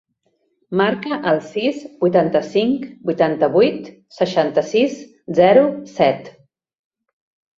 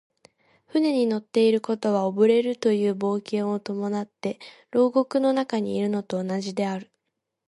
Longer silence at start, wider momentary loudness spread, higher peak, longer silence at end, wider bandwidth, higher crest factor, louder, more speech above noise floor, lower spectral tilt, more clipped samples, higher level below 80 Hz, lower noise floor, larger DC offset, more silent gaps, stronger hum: about the same, 0.7 s vs 0.75 s; about the same, 9 LU vs 9 LU; first, -2 dBFS vs -8 dBFS; first, 1.3 s vs 0.65 s; second, 7.6 kHz vs 11.5 kHz; about the same, 16 dB vs 16 dB; first, -18 LUFS vs -24 LUFS; second, 50 dB vs 57 dB; about the same, -6.5 dB/octave vs -6.5 dB/octave; neither; first, -62 dBFS vs -74 dBFS; second, -67 dBFS vs -81 dBFS; neither; neither; neither